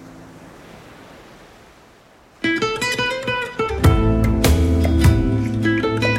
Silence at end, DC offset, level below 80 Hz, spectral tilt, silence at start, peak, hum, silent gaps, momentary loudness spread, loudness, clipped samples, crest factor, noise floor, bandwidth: 0 s; under 0.1%; -26 dBFS; -6 dB/octave; 0 s; 0 dBFS; none; none; 7 LU; -18 LUFS; under 0.1%; 18 dB; -49 dBFS; 16 kHz